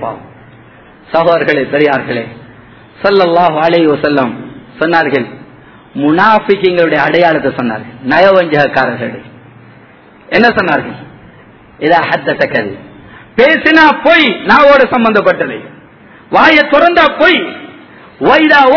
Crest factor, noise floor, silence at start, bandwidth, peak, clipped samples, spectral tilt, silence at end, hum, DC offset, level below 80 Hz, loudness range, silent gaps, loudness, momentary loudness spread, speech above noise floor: 10 dB; -39 dBFS; 0 s; 5.4 kHz; 0 dBFS; 2%; -6.5 dB/octave; 0 s; none; under 0.1%; -46 dBFS; 5 LU; none; -9 LUFS; 16 LU; 30 dB